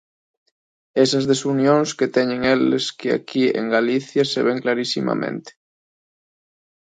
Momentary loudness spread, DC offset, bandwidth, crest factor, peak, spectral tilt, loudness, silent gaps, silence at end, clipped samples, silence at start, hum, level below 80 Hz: 6 LU; under 0.1%; 9.4 kHz; 18 dB; -2 dBFS; -5 dB/octave; -20 LUFS; none; 1.35 s; under 0.1%; 0.95 s; none; -62 dBFS